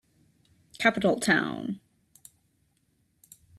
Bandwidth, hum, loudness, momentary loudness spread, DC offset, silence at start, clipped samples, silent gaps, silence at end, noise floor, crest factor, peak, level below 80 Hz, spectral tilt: 14.5 kHz; none; -26 LUFS; 14 LU; under 0.1%; 0.8 s; under 0.1%; none; 1.8 s; -71 dBFS; 24 dB; -6 dBFS; -68 dBFS; -4.5 dB/octave